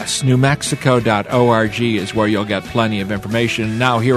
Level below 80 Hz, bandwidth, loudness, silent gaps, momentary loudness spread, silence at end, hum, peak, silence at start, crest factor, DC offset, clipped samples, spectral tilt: -44 dBFS; 13.5 kHz; -16 LUFS; none; 5 LU; 0 s; none; 0 dBFS; 0 s; 16 dB; under 0.1%; under 0.1%; -5 dB/octave